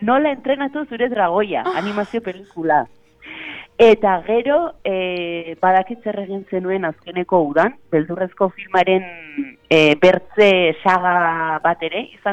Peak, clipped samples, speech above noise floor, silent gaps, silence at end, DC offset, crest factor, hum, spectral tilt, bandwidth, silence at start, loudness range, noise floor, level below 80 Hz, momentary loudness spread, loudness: -2 dBFS; under 0.1%; 19 dB; none; 0 s; under 0.1%; 16 dB; none; -6 dB/octave; 8.4 kHz; 0 s; 5 LU; -36 dBFS; -56 dBFS; 14 LU; -18 LUFS